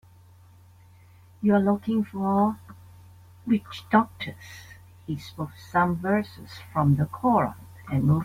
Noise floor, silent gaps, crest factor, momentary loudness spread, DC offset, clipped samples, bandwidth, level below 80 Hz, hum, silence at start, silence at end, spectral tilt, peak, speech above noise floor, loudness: -53 dBFS; none; 20 dB; 18 LU; under 0.1%; under 0.1%; 15.5 kHz; -56 dBFS; none; 1.4 s; 0 s; -8 dB/octave; -6 dBFS; 28 dB; -25 LUFS